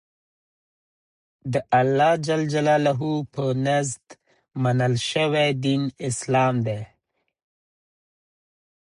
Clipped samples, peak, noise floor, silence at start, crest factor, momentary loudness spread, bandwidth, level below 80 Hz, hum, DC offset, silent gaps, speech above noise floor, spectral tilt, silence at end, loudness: under 0.1%; -8 dBFS; -75 dBFS; 1.45 s; 18 dB; 10 LU; 11 kHz; -62 dBFS; none; under 0.1%; none; 53 dB; -5.5 dB/octave; 2.05 s; -22 LUFS